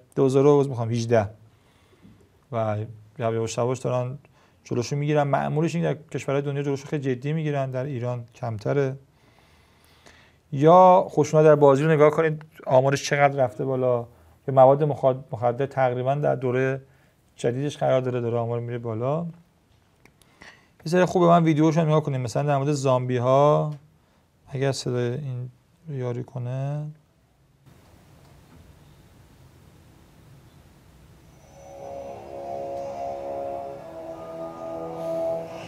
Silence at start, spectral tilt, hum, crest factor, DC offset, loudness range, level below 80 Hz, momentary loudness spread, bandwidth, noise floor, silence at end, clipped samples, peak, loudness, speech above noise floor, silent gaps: 0.15 s; -7 dB/octave; none; 22 dB; under 0.1%; 16 LU; -64 dBFS; 18 LU; 12.5 kHz; -61 dBFS; 0 s; under 0.1%; -2 dBFS; -23 LUFS; 39 dB; none